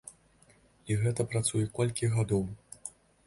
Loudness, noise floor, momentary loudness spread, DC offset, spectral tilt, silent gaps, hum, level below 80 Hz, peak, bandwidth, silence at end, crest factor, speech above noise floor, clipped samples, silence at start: -31 LUFS; -63 dBFS; 16 LU; under 0.1%; -5.5 dB/octave; none; none; -56 dBFS; -14 dBFS; 11.5 kHz; 0.4 s; 18 dB; 33 dB; under 0.1%; 0.05 s